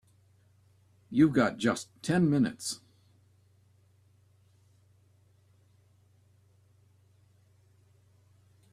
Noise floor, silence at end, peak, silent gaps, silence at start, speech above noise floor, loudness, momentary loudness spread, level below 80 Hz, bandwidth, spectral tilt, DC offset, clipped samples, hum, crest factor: -64 dBFS; 5.95 s; -12 dBFS; none; 1.1 s; 37 dB; -28 LUFS; 13 LU; -68 dBFS; 14 kHz; -6 dB/octave; under 0.1%; under 0.1%; 60 Hz at -60 dBFS; 22 dB